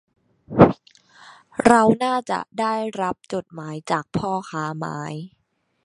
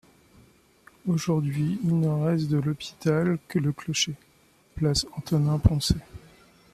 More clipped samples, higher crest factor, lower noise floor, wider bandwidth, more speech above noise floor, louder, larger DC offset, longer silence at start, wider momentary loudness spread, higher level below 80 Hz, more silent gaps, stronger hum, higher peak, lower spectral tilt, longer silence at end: neither; about the same, 22 dB vs 20 dB; second, -52 dBFS vs -60 dBFS; second, 11.5 kHz vs 14 kHz; second, 30 dB vs 36 dB; first, -21 LUFS vs -26 LUFS; neither; second, 0.5 s vs 1.05 s; first, 18 LU vs 6 LU; second, -50 dBFS vs -42 dBFS; neither; neither; first, 0 dBFS vs -6 dBFS; about the same, -6.5 dB/octave vs -5.5 dB/octave; about the same, 0.55 s vs 0.55 s